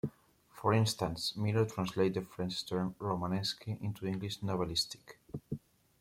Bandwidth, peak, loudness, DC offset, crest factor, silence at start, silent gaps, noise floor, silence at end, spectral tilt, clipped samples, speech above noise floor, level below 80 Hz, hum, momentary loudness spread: 16 kHz; -16 dBFS; -35 LUFS; under 0.1%; 20 dB; 0.05 s; none; -61 dBFS; 0.4 s; -5.5 dB/octave; under 0.1%; 27 dB; -62 dBFS; none; 12 LU